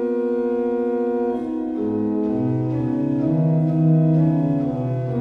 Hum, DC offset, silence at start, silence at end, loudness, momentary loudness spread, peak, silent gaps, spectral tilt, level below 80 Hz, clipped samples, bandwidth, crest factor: none; under 0.1%; 0 s; 0 s; -21 LUFS; 7 LU; -8 dBFS; none; -11.5 dB/octave; -52 dBFS; under 0.1%; 3.6 kHz; 12 dB